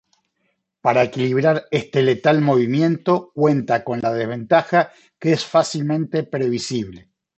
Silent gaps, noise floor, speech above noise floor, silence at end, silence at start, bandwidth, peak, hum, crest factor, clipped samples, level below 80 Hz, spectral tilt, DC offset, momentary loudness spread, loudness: none; -71 dBFS; 52 dB; 0.4 s; 0.85 s; 8.4 kHz; -2 dBFS; none; 18 dB; under 0.1%; -60 dBFS; -6.5 dB/octave; under 0.1%; 7 LU; -19 LUFS